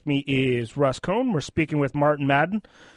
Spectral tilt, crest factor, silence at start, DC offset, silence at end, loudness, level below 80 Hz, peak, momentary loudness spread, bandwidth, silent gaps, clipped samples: -6.5 dB/octave; 16 dB; 0.05 s; under 0.1%; 0.35 s; -23 LUFS; -52 dBFS; -8 dBFS; 4 LU; 11 kHz; none; under 0.1%